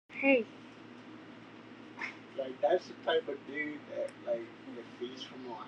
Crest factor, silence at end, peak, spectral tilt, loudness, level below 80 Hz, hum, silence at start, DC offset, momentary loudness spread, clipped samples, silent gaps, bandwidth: 24 dB; 0 s; -14 dBFS; -5 dB/octave; -35 LUFS; -84 dBFS; none; 0.1 s; under 0.1%; 21 LU; under 0.1%; none; 9.6 kHz